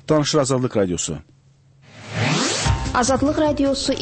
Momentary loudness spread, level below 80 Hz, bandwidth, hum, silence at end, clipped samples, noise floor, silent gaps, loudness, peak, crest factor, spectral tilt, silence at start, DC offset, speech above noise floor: 7 LU; -36 dBFS; 8.8 kHz; none; 0 s; under 0.1%; -53 dBFS; none; -20 LUFS; -6 dBFS; 14 dB; -4.5 dB/octave; 0.1 s; under 0.1%; 34 dB